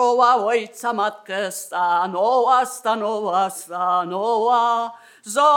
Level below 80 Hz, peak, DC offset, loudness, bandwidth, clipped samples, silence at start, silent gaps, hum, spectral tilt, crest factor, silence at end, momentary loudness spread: under -90 dBFS; -4 dBFS; under 0.1%; -20 LUFS; 18 kHz; under 0.1%; 0 s; none; none; -3 dB/octave; 16 dB; 0 s; 9 LU